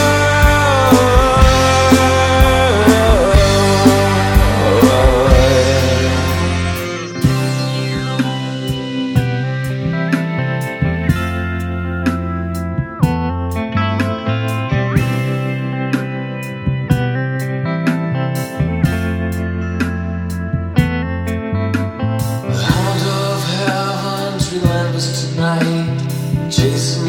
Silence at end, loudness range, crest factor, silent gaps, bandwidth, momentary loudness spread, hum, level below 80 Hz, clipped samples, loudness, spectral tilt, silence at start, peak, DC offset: 0 s; 8 LU; 14 dB; none; 19 kHz; 10 LU; none; -24 dBFS; under 0.1%; -15 LUFS; -5.5 dB/octave; 0 s; 0 dBFS; under 0.1%